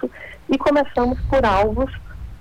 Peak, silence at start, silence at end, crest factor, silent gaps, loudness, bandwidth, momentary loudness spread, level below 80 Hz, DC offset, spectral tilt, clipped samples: -10 dBFS; 0 s; 0 s; 10 dB; none; -19 LUFS; 18 kHz; 19 LU; -32 dBFS; under 0.1%; -7 dB/octave; under 0.1%